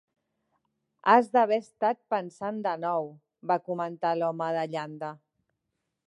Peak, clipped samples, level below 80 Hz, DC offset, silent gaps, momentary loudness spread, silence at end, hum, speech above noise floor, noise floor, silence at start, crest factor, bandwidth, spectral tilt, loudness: -6 dBFS; under 0.1%; -82 dBFS; under 0.1%; none; 15 LU; 0.9 s; none; 55 dB; -82 dBFS; 1.05 s; 24 dB; 11 kHz; -6.5 dB/octave; -28 LUFS